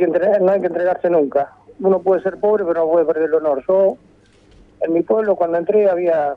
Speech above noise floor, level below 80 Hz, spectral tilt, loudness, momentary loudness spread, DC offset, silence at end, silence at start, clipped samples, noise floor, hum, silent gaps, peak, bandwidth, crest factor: 34 dB; -58 dBFS; -9.5 dB/octave; -17 LUFS; 5 LU; under 0.1%; 0 s; 0 s; under 0.1%; -50 dBFS; none; none; -4 dBFS; 4.9 kHz; 14 dB